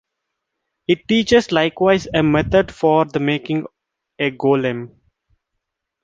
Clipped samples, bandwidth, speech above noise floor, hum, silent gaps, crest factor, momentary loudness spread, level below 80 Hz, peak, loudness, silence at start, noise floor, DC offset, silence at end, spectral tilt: under 0.1%; 7.8 kHz; 61 dB; none; none; 18 dB; 10 LU; -44 dBFS; -2 dBFS; -17 LUFS; 0.9 s; -78 dBFS; under 0.1%; 1.15 s; -6 dB/octave